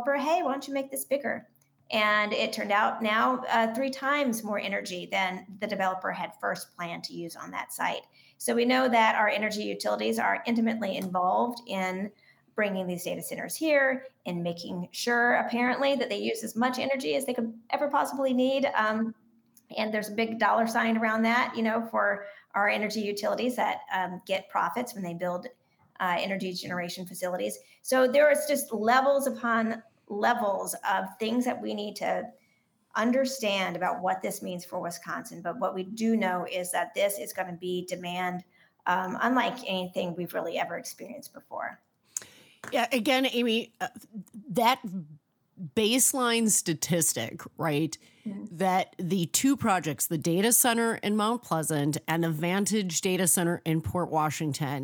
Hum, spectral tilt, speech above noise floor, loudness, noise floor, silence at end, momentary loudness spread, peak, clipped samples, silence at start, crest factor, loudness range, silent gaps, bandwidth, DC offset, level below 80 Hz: none; -3.5 dB/octave; 41 dB; -28 LUFS; -69 dBFS; 0 s; 12 LU; -8 dBFS; under 0.1%; 0 s; 20 dB; 5 LU; none; over 20 kHz; under 0.1%; -76 dBFS